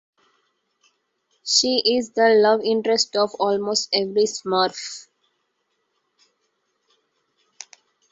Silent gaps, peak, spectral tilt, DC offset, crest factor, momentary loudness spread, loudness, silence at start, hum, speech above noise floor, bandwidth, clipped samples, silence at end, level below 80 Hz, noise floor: none; -4 dBFS; -2 dB/octave; under 0.1%; 20 dB; 21 LU; -19 LUFS; 1.45 s; none; 53 dB; 8 kHz; under 0.1%; 3.1 s; -70 dBFS; -73 dBFS